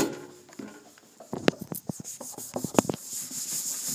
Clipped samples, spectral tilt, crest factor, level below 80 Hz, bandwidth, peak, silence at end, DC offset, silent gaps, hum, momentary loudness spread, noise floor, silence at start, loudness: under 0.1%; -3.5 dB/octave; 32 dB; -66 dBFS; 16 kHz; 0 dBFS; 0 s; under 0.1%; none; none; 18 LU; -52 dBFS; 0 s; -31 LUFS